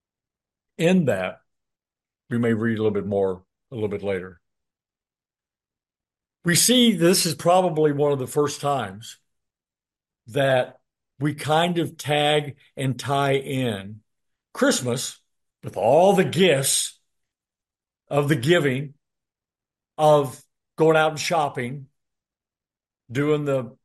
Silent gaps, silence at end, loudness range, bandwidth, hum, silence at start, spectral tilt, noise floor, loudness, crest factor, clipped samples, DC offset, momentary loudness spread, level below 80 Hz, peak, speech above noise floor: none; 0.15 s; 6 LU; 12.5 kHz; none; 0.8 s; -4.5 dB/octave; under -90 dBFS; -22 LUFS; 20 dB; under 0.1%; under 0.1%; 14 LU; -66 dBFS; -4 dBFS; over 69 dB